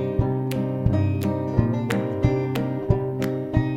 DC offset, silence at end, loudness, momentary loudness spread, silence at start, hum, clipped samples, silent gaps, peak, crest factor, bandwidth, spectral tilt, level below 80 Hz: under 0.1%; 0 s; -24 LUFS; 3 LU; 0 s; none; under 0.1%; none; -4 dBFS; 18 dB; 17 kHz; -8.5 dB/octave; -36 dBFS